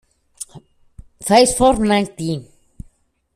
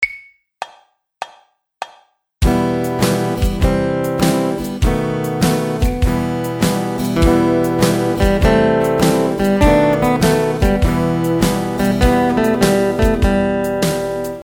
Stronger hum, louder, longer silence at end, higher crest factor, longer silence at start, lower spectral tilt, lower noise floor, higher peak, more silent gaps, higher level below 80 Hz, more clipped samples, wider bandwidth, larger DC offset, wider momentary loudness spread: neither; about the same, -16 LUFS vs -16 LUFS; first, 0.9 s vs 0 s; about the same, 18 dB vs 16 dB; first, 0.4 s vs 0 s; second, -4 dB/octave vs -6 dB/octave; about the same, -55 dBFS vs -52 dBFS; about the same, 0 dBFS vs 0 dBFS; neither; second, -40 dBFS vs -24 dBFS; neither; second, 14.5 kHz vs over 20 kHz; neither; first, 21 LU vs 8 LU